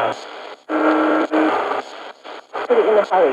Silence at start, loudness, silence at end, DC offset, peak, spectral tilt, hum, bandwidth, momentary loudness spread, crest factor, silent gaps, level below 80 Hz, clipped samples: 0 s; -18 LUFS; 0 s; under 0.1%; -4 dBFS; -5 dB/octave; none; 9.4 kHz; 19 LU; 14 dB; none; -86 dBFS; under 0.1%